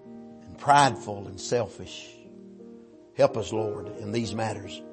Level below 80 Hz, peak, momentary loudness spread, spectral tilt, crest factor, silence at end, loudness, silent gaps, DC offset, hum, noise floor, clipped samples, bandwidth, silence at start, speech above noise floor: -62 dBFS; -6 dBFS; 26 LU; -4.5 dB/octave; 22 dB; 0 s; -27 LUFS; none; under 0.1%; none; -49 dBFS; under 0.1%; 8.8 kHz; 0 s; 22 dB